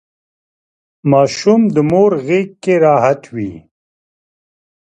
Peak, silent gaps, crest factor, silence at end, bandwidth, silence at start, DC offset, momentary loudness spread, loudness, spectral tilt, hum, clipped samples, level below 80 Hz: 0 dBFS; none; 16 dB; 1.35 s; 9.4 kHz; 1.05 s; under 0.1%; 11 LU; -13 LUFS; -6.5 dB/octave; none; under 0.1%; -54 dBFS